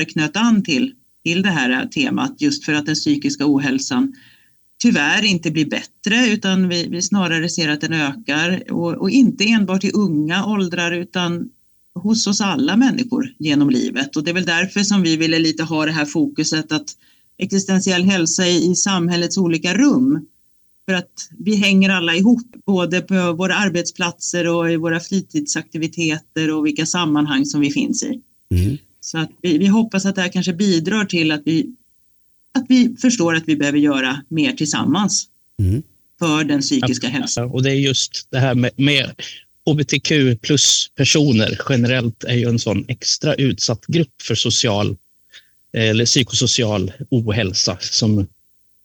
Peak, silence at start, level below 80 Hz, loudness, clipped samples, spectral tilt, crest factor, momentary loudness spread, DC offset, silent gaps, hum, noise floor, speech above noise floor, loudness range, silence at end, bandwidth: -2 dBFS; 0 s; -50 dBFS; -17 LUFS; under 0.1%; -4 dB/octave; 14 dB; 8 LU; under 0.1%; none; none; -56 dBFS; 39 dB; 3 LU; 0.6 s; 19.5 kHz